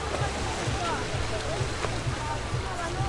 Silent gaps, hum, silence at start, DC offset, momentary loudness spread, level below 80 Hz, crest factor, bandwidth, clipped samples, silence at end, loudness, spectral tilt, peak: none; none; 0 s; under 0.1%; 2 LU; -38 dBFS; 16 dB; 11.5 kHz; under 0.1%; 0 s; -30 LUFS; -4.5 dB/octave; -14 dBFS